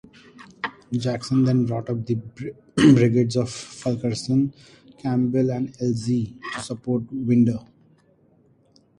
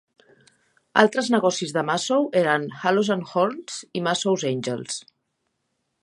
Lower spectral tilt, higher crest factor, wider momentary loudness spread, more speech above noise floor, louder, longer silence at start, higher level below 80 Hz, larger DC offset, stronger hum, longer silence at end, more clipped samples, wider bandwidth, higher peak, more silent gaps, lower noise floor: first, -7 dB/octave vs -4 dB/octave; about the same, 20 dB vs 24 dB; first, 14 LU vs 10 LU; second, 37 dB vs 53 dB; about the same, -23 LUFS vs -23 LUFS; second, 0.4 s vs 0.95 s; first, -56 dBFS vs -72 dBFS; neither; neither; first, 1.4 s vs 1.05 s; neither; about the same, 11 kHz vs 11.5 kHz; second, -4 dBFS vs 0 dBFS; neither; second, -59 dBFS vs -75 dBFS